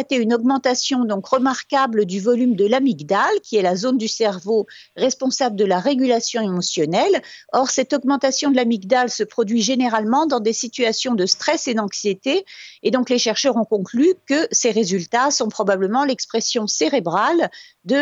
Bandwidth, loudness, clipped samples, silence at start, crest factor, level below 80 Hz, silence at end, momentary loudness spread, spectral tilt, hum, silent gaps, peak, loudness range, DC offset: 8 kHz; -19 LUFS; under 0.1%; 0 s; 16 dB; -72 dBFS; 0 s; 4 LU; -3.5 dB/octave; none; none; -2 dBFS; 1 LU; under 0.1%